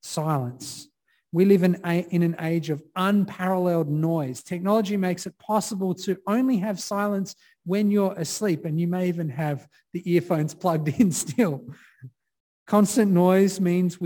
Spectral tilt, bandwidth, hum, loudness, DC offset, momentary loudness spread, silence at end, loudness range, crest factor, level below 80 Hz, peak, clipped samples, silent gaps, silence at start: -6.5 dB/octave; 19 kHz; none; -24 LUFS; under 0.1%; 11 LU; 0 s; 3 LU; 18 dB; -68 dBFS; -6 dBFS; under 0.1%; 12.40-12.66 s; 0.05 s